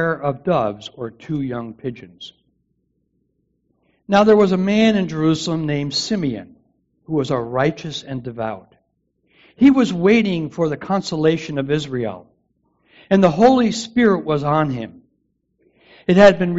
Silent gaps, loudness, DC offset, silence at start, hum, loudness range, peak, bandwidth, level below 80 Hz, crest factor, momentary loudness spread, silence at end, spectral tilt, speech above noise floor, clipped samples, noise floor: none; -18 LUFS; under 0.1%; 0 s; none; 8 LU; -2 dBFS; 8 kHz; -52 dBFS; 18 dB; 17 LU; 0 s; -5.5 dB/octave; 51 dB; under 0.1%; -68 dBFS